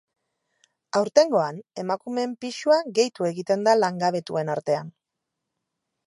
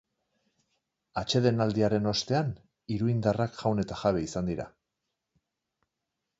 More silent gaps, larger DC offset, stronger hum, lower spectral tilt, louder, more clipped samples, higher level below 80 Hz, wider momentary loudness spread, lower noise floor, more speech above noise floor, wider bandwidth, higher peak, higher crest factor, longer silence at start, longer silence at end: neither; neither; neither; second, -4.5 dB/octave vs -6 dB/octave; first, -24 LUFS vs -29 LUFS; neither; second, -78 dBFS vs -56 dBFS; about the same, 10 LU vs 11 LU; about the same, -83 dBFS vs -85 dBFS; about the same, 60 dB vs 57 dB; first, 11.5 kHz vs 8 kHz; first, -4 dBFS vs -10 dBFS; about the same, 22 dB vs 20 dB; second, 0.95 s vs 1.15 s; second, 1.15 s vs 1.7 s